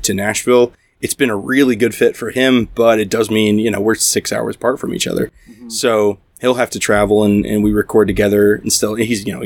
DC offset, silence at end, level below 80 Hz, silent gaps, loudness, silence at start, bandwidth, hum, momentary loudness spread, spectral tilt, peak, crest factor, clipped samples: under 0.1%; 0 s; -40 dBFS; none; -15 LUFS; 0 s; 19 kHz; none; 6 LU; -4 dB/octave; 0 dBFS; 14 dB; under 0.1%